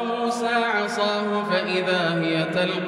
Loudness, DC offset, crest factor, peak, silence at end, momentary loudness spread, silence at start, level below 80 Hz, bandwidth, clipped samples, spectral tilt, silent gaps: -23 LUFS; under 0.1%; 14 dB; -10 dBFS; 0 s; 2 LU; 0 s; -68 dBFS; 13.5 kHz; under 0.1%; -5 dB/octave; none